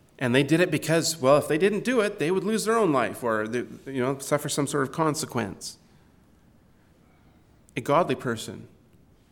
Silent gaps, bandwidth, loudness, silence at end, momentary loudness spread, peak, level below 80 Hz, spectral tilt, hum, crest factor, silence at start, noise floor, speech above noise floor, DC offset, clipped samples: none; 19 kHz; -25 LUFS; 0.65 s; 13 LU; -6 dBFS; -64 dBFS; -4.5 dB/octave; none; 20 dB; 0.2 s; -58 dBFS; 33 dB; under 0.1%; under 0.1%